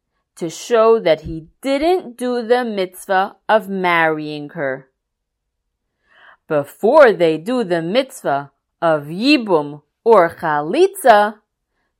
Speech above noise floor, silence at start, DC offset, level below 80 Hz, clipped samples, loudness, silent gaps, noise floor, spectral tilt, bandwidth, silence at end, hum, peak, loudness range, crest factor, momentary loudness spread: 60 dB; 0.4 s; under 0.1%; -52 dBFS; under 0.1%; -16 LUFS; none; -76 dBFS; -5 dB/octave; 16 kHz; 0.65 s; none; 0 dBFS; 5 LU; 18 dB; 12 LU